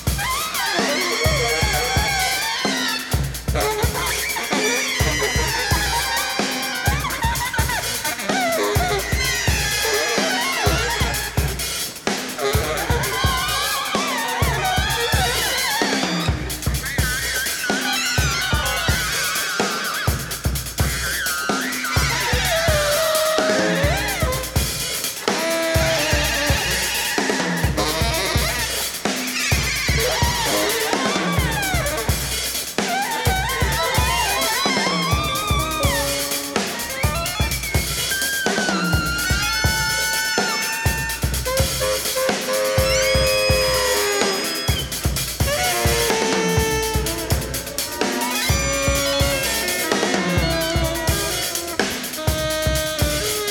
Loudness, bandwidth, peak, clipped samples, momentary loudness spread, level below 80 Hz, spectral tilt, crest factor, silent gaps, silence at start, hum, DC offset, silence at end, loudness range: -20 LUFS; 19.5 kHz; 0 dBFS; under 0.1%; 4 LU; -30 dBFS; -3 dB/octave; 20 dB; none; 0 s; none; under 0.1%; 0 s; 2 LU